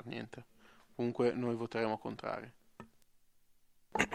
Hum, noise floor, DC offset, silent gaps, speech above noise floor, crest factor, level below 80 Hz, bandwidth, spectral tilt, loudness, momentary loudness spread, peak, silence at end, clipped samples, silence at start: none; -67 dBFS; under 0.1%; none; 29 dB; 28 dB; -68 dBFS; 13.5 kHz; -5.5 dB/octave; -38 LUFS; 22 LU; -12 dBFS; 0 s; under 0.1%; 0.05 s